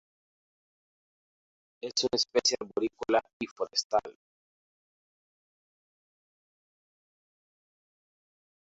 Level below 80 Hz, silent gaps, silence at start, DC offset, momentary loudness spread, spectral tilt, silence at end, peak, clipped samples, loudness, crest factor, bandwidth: -72 dBFS; 3.33-3.40 s, 3.51-3.56 s, 3.85-3.90 s; 1.85 s; under 0.1%; 12 LU; -1 dB/octave; 4.55 s; -12 dBFS; under 0.1%; -29 LUFS; 24 dB; 7.6 kHz